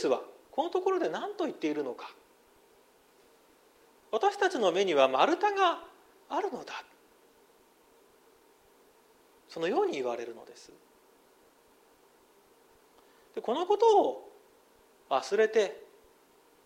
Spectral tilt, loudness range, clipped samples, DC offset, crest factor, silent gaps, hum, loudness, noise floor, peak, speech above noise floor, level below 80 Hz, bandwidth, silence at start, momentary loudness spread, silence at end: -3.5 dB/octave; 14 LU; under 0.1%; under 0.1%; 22 dB; none; none; -29 LUFS; -63 dBFS; -10 dBFS; 34 dB; -80 dBFS; 15.5 kHz; 0 s; 19 LU; 0.8 s